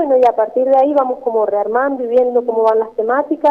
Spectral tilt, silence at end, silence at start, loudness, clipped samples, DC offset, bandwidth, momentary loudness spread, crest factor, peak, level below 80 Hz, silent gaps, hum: -6.5 dB/octave; 0 s; 0 s; -15 LUFS; under 0.1%; under 0.1%; 5.4 kHz; 5 LU; 12 dB; -2 dBFS; -58 dBFS; none; none